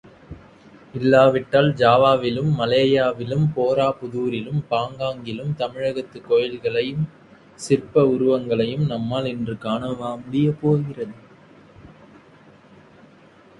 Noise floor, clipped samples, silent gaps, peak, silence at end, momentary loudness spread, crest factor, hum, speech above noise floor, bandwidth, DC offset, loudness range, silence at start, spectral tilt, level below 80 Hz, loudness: -50 dBFS; under 0.1%; none; -2 dBFS; 1.7 s; 12 LU; 20 dB; none; 30 dB; 11.5 kHz; under 0.1%; 8 LU; 0.3 s; -7 dB/octave; -54 dBFS; -21 LUFS